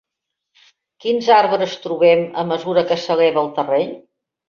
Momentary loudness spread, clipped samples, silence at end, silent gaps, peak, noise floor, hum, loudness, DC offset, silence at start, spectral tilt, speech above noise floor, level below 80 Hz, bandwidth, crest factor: 8 LU; under 0.1%; 0.5 s; none; -2 dBFS; -80 dBFS; none; -17 LUFS; under 0.1%; 1.05 s; -5.5 dB/octave; 64 dB; -64 dBFS; 7 kHz; 16 dB